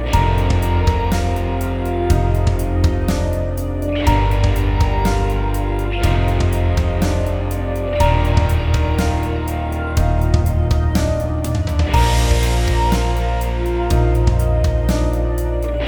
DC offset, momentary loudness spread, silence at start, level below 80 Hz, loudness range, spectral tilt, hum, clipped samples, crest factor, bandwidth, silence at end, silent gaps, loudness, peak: under 0.1%; 5 LU; 0 s; -20 dBFS; 1 LU; -6.5 dB/octave; none; under 0.1%; 16 dB; over 20 kHz; 0 s; none; -18 LUFS; 0 dBFS